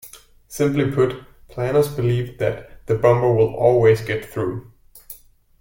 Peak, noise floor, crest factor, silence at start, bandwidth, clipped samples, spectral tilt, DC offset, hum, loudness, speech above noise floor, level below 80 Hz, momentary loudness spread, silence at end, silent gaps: -2 dBFS; -45 dBFS; 18 dB; 0.05 s; 17 kHz; under 0.1%; -7 dB/octave; under 0.1%; none; -19 LUFS; 26 dB; -46 dBFS; 21 LU; 0.45 s; none